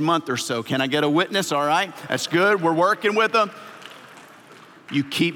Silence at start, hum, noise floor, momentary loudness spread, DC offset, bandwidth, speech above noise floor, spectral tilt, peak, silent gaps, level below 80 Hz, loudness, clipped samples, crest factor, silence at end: 0 s; none; -47 dBFS; 8 LU; under 0.1%; 17 kHz; 26 dB; -4 dB/octave; -6 dBFS; none; -80 dBFS; -21 LUFS; under 0.1%; 16 dB; 0 s